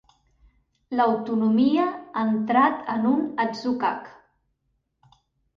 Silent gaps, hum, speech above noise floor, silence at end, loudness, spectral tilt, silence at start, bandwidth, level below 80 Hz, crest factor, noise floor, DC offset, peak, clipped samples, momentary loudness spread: none; none; 51 dB; 1.45 s; -23 LUFS; -7 dB/octave; 0.9 s; 6.6 kHz; -66 dBFS; 18 dB; -74 dBFS; under 0.1%; -6 dBFS; under 0.1%; 7 LU